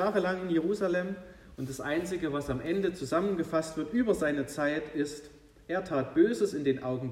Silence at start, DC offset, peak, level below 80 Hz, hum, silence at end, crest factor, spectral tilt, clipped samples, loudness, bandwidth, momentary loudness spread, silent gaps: 0 s; under 0.1%; -14 dBFS; -58 dBFS; none; 0 s; 16 dB; -6 dB/octave; under 0.1%; -31 LUFS; 15 kHz; 10 LU; none